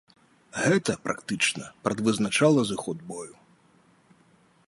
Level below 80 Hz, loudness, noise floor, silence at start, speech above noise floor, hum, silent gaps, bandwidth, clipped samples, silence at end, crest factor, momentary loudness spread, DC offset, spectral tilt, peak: -64 dBFS; -26 LUFS; -61 dBFS; 0.55 s; 35 dB; none; none; 11.5 kHz; under 0.1%; 1.35 s; 20 dB; 17 LU; under 0.1%; -4.5 dB/octave; -8 dBFS